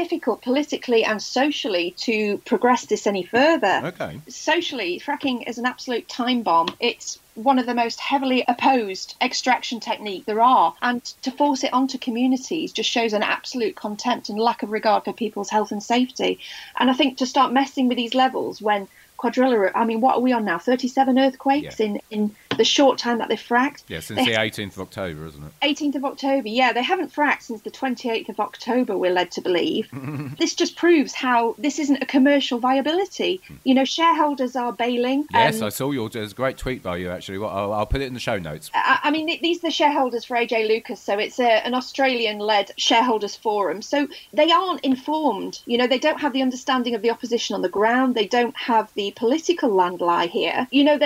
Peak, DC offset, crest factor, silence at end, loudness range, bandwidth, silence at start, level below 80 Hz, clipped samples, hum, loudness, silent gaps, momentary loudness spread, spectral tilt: -4 dBFS; under 0.1%; 16 dB; 0 s; 3 LU; 16 kHz; 0 s; -50 dBFS; under 0.1%; none; -21 LUFS; none; 9 LU; -4 dB/octave